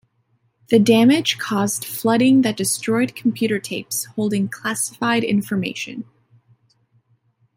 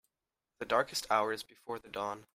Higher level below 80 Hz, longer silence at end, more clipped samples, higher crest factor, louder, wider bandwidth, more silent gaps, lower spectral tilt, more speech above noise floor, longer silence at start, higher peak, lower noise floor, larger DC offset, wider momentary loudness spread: first, -64 dBFS vs -70 dBFS; first, 1.55 s vs 0.15 s; neither; about the same, 18 dB vs 22 dB; first, -19 LUFS vs -34 LUFS; about the same, 16.5 kHz vs 16 kHz; neither; first, -4 dB/octave vs -2.5 dB/octave; second, 46 dB vs over 55 dB; about the same, 0.7 s vs 0.6 s; first, -2 dBFS vs -14 dBFS; second, -65 dBFS vs under -90 dBFS; neither; about the same, 10 LU vs 12 LU